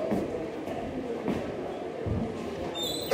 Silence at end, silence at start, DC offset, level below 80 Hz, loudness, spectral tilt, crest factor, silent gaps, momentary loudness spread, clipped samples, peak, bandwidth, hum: 0 s; 0 s; under 0.1%; -52 dBFS; -33 LUFS; -5.5 dB/octave; 22 dB; none; 4 LU; under 0.1%; -10 dBFS; 16 kHz; none